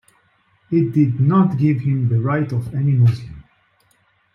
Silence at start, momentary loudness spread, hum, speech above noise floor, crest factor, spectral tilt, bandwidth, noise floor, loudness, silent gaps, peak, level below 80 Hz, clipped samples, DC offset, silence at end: 0.7 s; 7 LU; none; 44 dB; 14 dB; -10.5 dB/octave; 5.8 kHz; -61 dBFS; -18 LUFS; none; -4 dBFS; -52 dBFS; under 0.1%; under 0.1%; 0.95 s